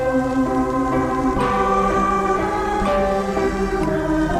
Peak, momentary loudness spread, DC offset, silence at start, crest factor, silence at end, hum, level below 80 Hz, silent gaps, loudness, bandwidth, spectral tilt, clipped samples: -6 dBFS; 3 LU; under 0.1%; 0 s; 12 dB; 0 s; none; -32 dBFS; none; -19 LUFS; 15 kHz; -6.5 dB/octave; under 0.1%